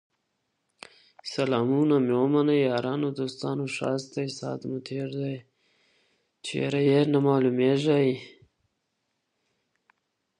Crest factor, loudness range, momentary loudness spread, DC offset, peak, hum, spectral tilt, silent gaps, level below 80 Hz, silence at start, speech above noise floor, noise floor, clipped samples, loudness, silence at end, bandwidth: 18 dB; 7 LU; 12 LU; under 0.1%; -10 dBFS; none; -7 dB/octave; none; -74 dBFS; 1.25 s; 53 dB; -78 dBFS; under 0.1%; -26 LUFS; 2.1 s; 10.5 kHz